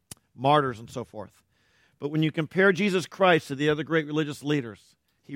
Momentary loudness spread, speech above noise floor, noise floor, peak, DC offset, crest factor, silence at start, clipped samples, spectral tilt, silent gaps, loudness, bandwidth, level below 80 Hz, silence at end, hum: 16 LU; 40 dB; -65 dBFS; -8 dBFS; under 0.1%; 20 dB; 0.4 s; under 0.1%; -6 dB/octave; none; -25 LUFS; 16 kHz; -66 dBFS; 0 s; none